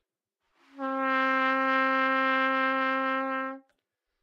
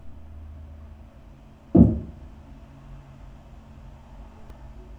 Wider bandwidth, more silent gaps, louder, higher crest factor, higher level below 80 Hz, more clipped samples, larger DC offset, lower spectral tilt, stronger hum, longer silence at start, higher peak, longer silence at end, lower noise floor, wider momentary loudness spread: first, 7 kHz vs 3.7 kHz; neither; second, -26 LUFS vs -20 LUFS; second, 16 dB vs 26 dB; second, under -90 dBFS vs -40 dBFS; neither; neither; second, -3.5 dB/octave vs -11.5 dB/octave; neither; first, 0.75 s vs 0.05 s; second, -14 dBFS vs -2 dBFS; first, 0.65 s vs 0.45 s; first, -83 dBFS vs -47 dBFS; second, 9 LU vs 29 LU